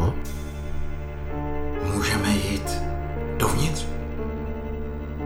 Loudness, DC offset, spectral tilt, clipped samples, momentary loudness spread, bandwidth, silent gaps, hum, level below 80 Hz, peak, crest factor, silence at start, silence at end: -28 LUFS; under 0.1%; -5 dB/octave; under 0.1%; 11 LU; over 20 kHz; none; none; -30 dBFS; -6 dBFS; 20 dB; 0 s; 0 s